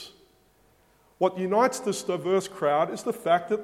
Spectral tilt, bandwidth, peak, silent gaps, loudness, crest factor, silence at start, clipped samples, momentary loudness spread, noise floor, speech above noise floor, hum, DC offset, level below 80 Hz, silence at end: -4.5 dB/octave; 16 kHz; -8 dBFS; none; -26 LUFS; 20 dB; 0 s; under 0.1%; 6 LU; -62 dBFS; 37 dB; none; under 0.1%; -70 dBFS; 0 s